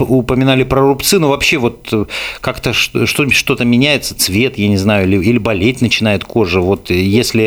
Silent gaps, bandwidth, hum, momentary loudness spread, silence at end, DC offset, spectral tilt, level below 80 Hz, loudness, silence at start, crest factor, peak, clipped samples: none; over 20 kHz; none; 5 LU; 0 s; under 0.1%; -4.5 dB/octave; -36 dBFS; -12 LUFS; 0 s; 12 dB; 0 dBFS; under 0.1%